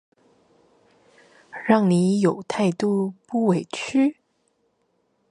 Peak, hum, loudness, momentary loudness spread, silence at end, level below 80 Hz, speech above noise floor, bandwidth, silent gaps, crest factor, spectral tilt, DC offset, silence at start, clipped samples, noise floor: -4 dBFS; none; -22 LUFS; 7 LU; 1.2 s; -68 dBFS; 48 dB; 11 kHz; none; 20 dB; -6.5 dB/octave; under 0.1%; 1.55 s; under 0.1%; -69 dBFS